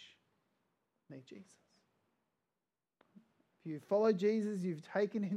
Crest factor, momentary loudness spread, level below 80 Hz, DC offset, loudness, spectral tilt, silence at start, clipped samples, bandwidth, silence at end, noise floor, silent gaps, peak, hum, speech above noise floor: 20 dB; 25 LU; under -90 dBFS; under 0.1%; -36 LUFS; -7.5 dB/octave; 0 s; under 0.1%; 10.5 kHz; 0 s; under -90 dBFS; none; -20 dBFS; none; over 54 dB